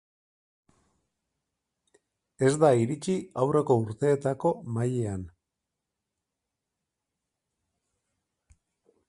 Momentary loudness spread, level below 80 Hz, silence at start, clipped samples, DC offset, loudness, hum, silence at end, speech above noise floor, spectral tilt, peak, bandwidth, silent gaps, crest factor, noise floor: 9 LU; -60 dBFS; 2.4 s; under 0.1%; under 0.1%; -26 LUFS; none; 3.8 s; 60 dB; -7 dB/octave; -8 dBFS; 11.5 kHz; none; 22 dB; -86 dBFS